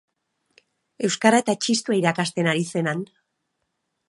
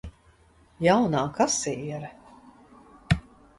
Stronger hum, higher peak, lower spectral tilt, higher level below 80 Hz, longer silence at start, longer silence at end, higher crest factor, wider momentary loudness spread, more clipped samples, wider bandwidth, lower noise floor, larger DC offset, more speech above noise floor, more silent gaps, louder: neither; first, -2 dBFS vs -8 dBFS; about the same, -4.5 dB/octave vs -4.5 dB/octave; second, -74 dBFS vs -46 dBFS; first, 1 s vs 0.05 s; first, 1.05 s vs 0.4 s; about the same, 22 dB vs 20 dB; second, 9 LU vs 16 LU; neither; about the same, 11.5 kHz vs 11.5 kHz; first, -77 dBFS vs -58 dBFS; neither; first, 55 dB vs 34 dB; neither; first, -22 LUFS vs -25 LUFS